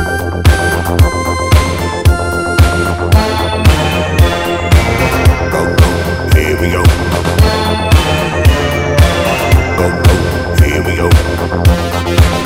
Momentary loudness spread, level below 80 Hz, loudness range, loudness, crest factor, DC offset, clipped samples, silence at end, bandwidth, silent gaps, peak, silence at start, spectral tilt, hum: 3 LU; -16 dBFS; 1 LU; -11 LUFS; 10 dB; 0.1%; 3%; 0 s; 16.5 kHz; none; 0 dBFS; 0 s; -5.5 dB/octave; none